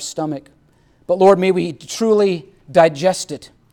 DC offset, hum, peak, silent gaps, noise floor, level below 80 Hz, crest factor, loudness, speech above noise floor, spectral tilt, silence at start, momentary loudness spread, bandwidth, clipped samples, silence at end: under 0.1%; none; 0 dBFS; none; -54 dBFS; -58 dBFS; 16 dB; -16 LUFS; 38 dB; -5 dB/octave; 0 s; 15 LU; 17 kHz; under 0.1%; 0.25 s